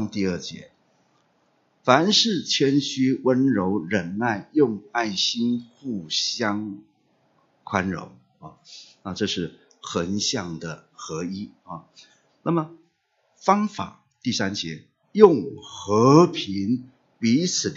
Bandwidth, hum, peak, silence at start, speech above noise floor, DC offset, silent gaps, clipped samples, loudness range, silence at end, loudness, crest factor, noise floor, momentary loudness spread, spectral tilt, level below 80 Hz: 7.8 kHz; none; 0 dBFS; 0 s; 46 dB; under 0.1%; none; under 0.1%; 9 LU; 0 s; -22 LUFS; 24 dB; -69 dBFS; 20 LU; -4.5 dB/octave; -64 dBFS